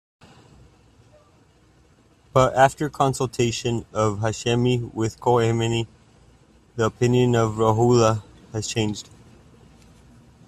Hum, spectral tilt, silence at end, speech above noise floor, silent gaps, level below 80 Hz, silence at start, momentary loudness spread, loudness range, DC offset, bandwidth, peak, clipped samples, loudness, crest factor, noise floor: none; -5.5 dB/octave; 1.45 s; 36 dB; none; -50 dBFS; 2.35 s; 10 LU; 2 LU; under 0.1%; 13 kHz; -2 dBFS; under 0.1%; -22 LUFS; 20 dB; -56 dBFS